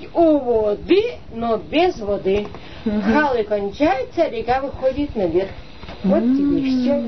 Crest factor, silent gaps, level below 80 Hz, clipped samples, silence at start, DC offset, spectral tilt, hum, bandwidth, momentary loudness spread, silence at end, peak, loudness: 16 dB; none; -40 dBFS; under 0.1%; 0 s; 1%; -7.5 dB/octave; none; 6.2 kHz; 9 LU; 0 s; -4 dBFS; -19 LUFS